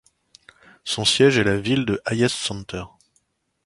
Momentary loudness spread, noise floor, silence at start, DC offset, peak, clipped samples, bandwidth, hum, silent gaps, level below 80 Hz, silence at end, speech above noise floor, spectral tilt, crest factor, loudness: 18 LU; -68 dBFS; 0.85 s; under 0.1%; -4 dBFS; under 0.1%; 11.5 kHz; none; none; -50 dBFS; 0.8 s; 47 dB; -4 dB/octave; 20 dB; -20 LUFS